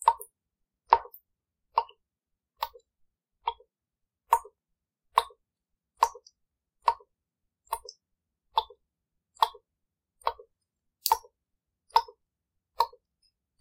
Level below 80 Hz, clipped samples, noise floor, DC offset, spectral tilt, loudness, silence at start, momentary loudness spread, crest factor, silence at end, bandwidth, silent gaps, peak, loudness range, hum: -66 dBFS; under 0.1%; -86 dBFS; under 0.1%; 0 dB/octave; -31 LUFS; 0 s; 18 LU; 32 dB; 0.75 s; 16 kHz; none; -2 dBFS; 4 LU; none